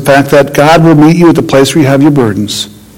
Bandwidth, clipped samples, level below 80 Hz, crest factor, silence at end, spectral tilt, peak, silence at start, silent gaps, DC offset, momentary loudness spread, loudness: 17.5 kHz; 20%; -36 dBFS; 6 dB; 0.25 s; -6 dB/octave; 0 dBFS; 0 s; none; under 0.1%; 8 LU; -6 LUFS